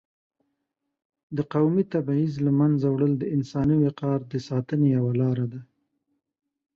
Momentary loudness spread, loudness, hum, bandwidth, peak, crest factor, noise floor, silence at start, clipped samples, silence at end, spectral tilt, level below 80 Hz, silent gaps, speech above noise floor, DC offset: 7 LU; -24 LUFS; none; 7 kHz; -10 dBFS; 14 dB; -81 dBFS; 1.3 s; under 0.1%; 1.15 s; -9.5 dB/octave; -58 dBFS; none; 57 dB; under 0.1%